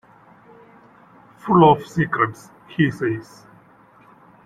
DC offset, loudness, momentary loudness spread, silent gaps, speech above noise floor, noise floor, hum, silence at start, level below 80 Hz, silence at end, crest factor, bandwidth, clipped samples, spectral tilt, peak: under 0.1%; -19 LUFS; 17 LU; none; 33 dB; -51 dBFS; none; 1.45 s; -56 dBFS; 1.25 s; 20 dB; 13 kHz; under 0.1%; -7.5 dB/octave; -2 dBFS